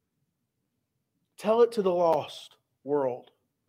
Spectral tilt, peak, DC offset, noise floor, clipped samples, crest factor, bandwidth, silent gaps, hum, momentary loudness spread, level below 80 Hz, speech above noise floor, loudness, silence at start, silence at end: -6 dB/octave; -10 dBFS; under 0.1%; -80 dBFS; under 0.1%; 18 dB; 15 kHz; none; none; 18 LU; -82 dBFS; 54 dB; -27 LUFS; 1.4 s; 0.5 s